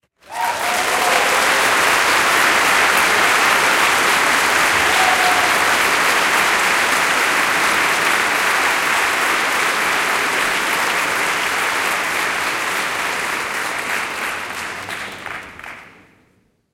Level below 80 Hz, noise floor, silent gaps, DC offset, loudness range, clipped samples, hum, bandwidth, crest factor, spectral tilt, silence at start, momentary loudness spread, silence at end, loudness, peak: -52 dBFS; -59 dBFS; none; under 0.1%; 8 LU; under 0.1%; none; 17 kHz; 16 dB; -0.5 dB/octave; 0.3 s; 10 LU; 0.9 s; -15 LUFS; -2 dBFS